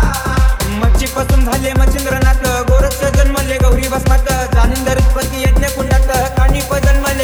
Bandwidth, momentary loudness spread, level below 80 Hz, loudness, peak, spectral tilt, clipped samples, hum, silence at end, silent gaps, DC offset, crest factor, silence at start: over 20 kHz; 2 LU; -14 dBFS; -14 LUFS; -2 dBFS; -5 dB/octave; under 0.1%; none; 0 s; none; under 0.1%; 10 dB; 0 s